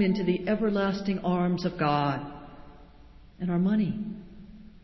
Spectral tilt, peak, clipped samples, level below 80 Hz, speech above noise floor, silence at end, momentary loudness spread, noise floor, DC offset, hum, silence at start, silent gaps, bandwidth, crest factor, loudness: -8 dB/octave; -12 dBFS; under 0.1%; -54 dBFS; 24 dB; 0.05 s; 19 LU; -51 dBFS; under 0.1%; none; 0 s; none; 6 kHz; 16 dB; -28 LUFS